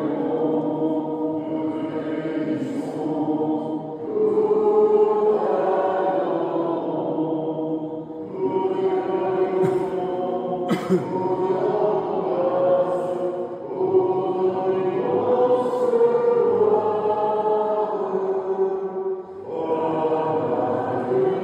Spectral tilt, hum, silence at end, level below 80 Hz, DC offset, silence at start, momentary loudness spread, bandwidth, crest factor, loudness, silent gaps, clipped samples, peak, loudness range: -8.5 dB/octave; none; 0 s; -66 dBFS; under 0.1%; 0 s; 8 LU; 9.4 kHz; 14 dB; -22 LUFS; none; under 0.1%; -8 dBFS; 4 LU